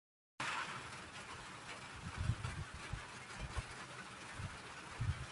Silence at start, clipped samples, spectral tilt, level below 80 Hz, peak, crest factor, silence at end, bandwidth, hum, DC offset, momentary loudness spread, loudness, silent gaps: 0.4 s; under 0.1%; -4 dB/octave; -54 dBFS; -24 dBFS; 22 dB; 0 s; 11.5 kHz; none; under 0.1%; 8 LU; -46 LUFS; none